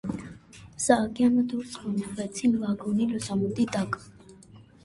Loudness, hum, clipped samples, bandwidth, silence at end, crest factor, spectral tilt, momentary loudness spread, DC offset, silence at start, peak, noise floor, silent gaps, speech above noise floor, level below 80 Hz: -27 LUFS; none; under 0.1%; 11.5 kHz; 0.25 s; 22 dB; -5.5 dB/octave; 13 LU; under 0.1%; 0.05 s; -6 dBFS; -52 dBFS; none; 25 dB; -58 dBFS